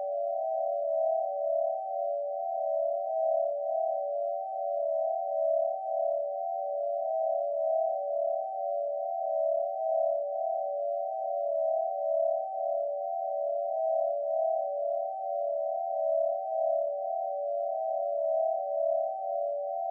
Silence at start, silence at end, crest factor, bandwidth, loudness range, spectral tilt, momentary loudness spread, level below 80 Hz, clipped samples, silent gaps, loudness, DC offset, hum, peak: 0 s; 0 s; 12 dB; 0.9 kHz; 1 LU; 24 dB/octave; 4 LU; under -90 dBFS; under 0.1%; none; -31 LUFS; under 0.1%; none; -20 dBFS